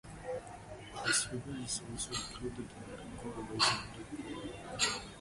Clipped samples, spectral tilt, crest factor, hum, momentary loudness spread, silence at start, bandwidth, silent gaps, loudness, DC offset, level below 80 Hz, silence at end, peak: under 0.1%; -2 dB/octave; 24 dB; none; 16 LU; 0.05 s; 12 kHz; none; -36 LUFS; under 0.1%; -58 dBFS; 0 s; -16 dBFS